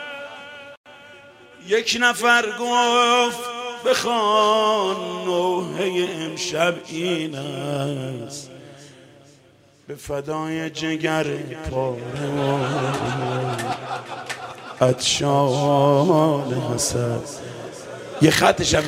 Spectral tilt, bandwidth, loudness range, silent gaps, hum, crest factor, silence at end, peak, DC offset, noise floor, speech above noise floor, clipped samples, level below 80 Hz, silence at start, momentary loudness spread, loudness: -4 dB/octave; 16 kHz; 9 LU; 0.77-0.84 s; none; 22 dB; 0 s; 0 dBFS; under 0.1%; -53 dBFS; 33 dB; under 0.1%; -52 dBFS; 0 s; 18 LU; -21 LUFS